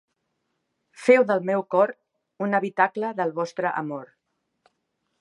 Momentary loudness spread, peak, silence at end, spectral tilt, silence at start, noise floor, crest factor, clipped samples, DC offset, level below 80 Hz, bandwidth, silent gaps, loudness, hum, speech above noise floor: 12 LU; -4 dBFS; 1.15 s; -6.5 dB/octave; 1 s; -76 dBFS; 22 dB; under 0.1%; under 0.1%; -82 dBFS; 11 kHz; none; -23 LUFS; none; 54 dB